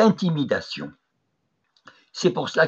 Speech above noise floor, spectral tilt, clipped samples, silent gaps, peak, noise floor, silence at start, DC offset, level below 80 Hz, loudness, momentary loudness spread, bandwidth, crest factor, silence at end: 51 dB; -5.5 dB/octave; under 0.1%; none; -6 dBFS; -74 dBFS; 0 s; under 0.1%; -68 dBFS; -24 LUFS; 16 LU; 8.2 kHz; 18 dB; 0 s